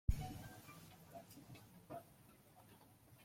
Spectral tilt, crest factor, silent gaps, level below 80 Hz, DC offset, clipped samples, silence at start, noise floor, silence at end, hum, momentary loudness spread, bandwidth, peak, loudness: -6 dB/octave; 28 dB; none; -52 dBFS; under 0.1%; under 0.1%; 0.1 s; -66 dBFS; 0 s; none; 16 LU; 16.5 kHz; -22 dBFS; -54 LUFS